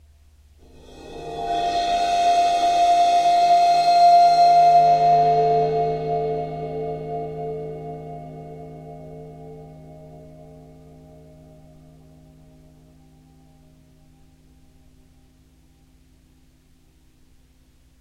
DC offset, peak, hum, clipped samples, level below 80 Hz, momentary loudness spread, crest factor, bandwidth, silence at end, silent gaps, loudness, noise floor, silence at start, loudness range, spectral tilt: under 0.1%; -6 dBFS; none; under 0.1%; -52 dBFS; 25 LU; 16 dB; 10.5 kHz; 7.75 s; none; -18 LUFS; -55 dBFS; 0.95 s; 23 LU; -4.5 dB/octave